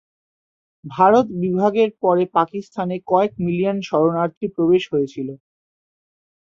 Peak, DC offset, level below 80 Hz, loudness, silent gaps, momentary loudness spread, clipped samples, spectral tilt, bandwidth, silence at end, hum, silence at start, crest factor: -2 dBFS; under 0.1%; -60 dBFS; -19 LUFS; 4.37-4.41 s; 11 LU; under 0.1%; -7.5 dB/octave; 7.4 kHz; 1.2 s; none; 0.85 s; 18 dB